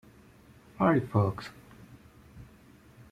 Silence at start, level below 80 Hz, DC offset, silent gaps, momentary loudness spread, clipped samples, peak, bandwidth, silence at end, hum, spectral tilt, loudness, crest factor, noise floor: 0.8 s; -60 dBFS; under 0.1%; none; 27 LU; under 0.1%; -12 dBFS; 13.5 kHz; 0.65 s; none; -8.5 dB/octave; -28 LUFS; 22 dB; -56 dBFS